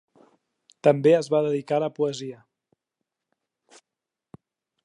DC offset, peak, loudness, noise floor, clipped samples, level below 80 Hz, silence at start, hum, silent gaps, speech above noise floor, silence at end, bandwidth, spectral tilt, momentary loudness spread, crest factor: under 0.1%; -4 dBFS; -23 LUFS; -87 dBFS; under 0.1%; -78 dBFS; 0.85 s; none; none; 65 dB; 2.5 s; 10.5 kHz; -6.5 dB/octave; 11 LU; 22 dB